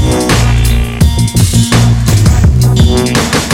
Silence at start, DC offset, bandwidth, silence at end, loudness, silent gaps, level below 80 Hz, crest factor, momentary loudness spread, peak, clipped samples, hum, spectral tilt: 0 s; under 0.1%; 16.5 kHz; 0 s; -9 LUFS; none; -14 dBFS; 8 dB; 3 LU; 0 dBFS; 0.2%; none; -5 dB/octave